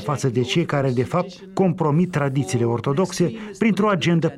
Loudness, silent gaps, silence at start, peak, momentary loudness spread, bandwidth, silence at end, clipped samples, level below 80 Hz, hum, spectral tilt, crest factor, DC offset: -21 LUFS; none; 0 s; -8 dBFS; 5 LU; 12.5 kHz; 0 s; under 0.1%; -54 dBFS; none; -6.5 dB/octave; 14 dB; under 0.1%